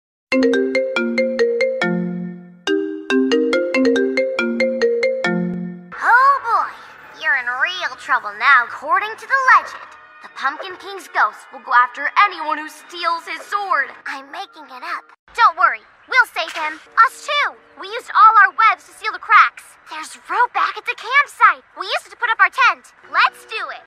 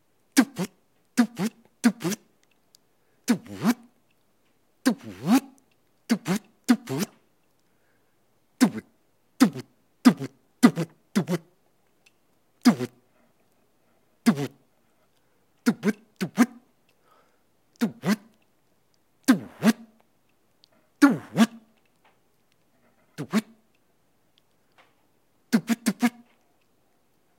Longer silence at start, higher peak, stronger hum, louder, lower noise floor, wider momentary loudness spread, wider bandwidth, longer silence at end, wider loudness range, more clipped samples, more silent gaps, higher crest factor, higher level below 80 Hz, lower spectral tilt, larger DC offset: about the same, 0.3 s vs 0.35 s; about the same, 0 dBFS vs -2 dBFS; neither; first, -17 LUFS vs -26 LUFS; second, -39 dBFS vs -69 dBFS; first, 17 LU vs 13 LU; second, 14.5 kHz vs 16.5 kHz; second, 0.05 s vs 1.3 s; about the same, 5 LU vs 6 LU; neither; first, 15.19-15.27 s vs none; second, 18 dB vs 26 dB; first, -66 dBFS vs -78 dBFS; about the same, -4 dB/octave vs -5 dB/octave; neither